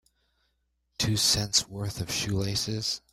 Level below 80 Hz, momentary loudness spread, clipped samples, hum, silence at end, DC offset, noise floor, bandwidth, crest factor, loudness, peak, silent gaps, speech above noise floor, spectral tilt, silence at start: -52 dBFS; 11 LU; under 0.1%; none; 0.15 s; under 0.1%; -75 dBFS; 16 kHz; 22 dB; -27 LUFS; -8 dBFS; none; 47 dB; -3 dB/octave; 1 s